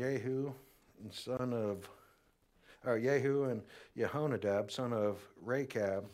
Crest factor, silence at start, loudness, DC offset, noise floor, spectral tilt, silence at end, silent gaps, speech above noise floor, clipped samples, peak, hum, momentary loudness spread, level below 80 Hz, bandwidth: 18 dB; 0 s; -37 LUFS; under 0.1%; -71 dBFS; -6.5 dB/octave; 0 s; none; 35 dB; under 0.1%; -20 dBFS; none; 14 LU; -74 dBFS; 15.5 kHz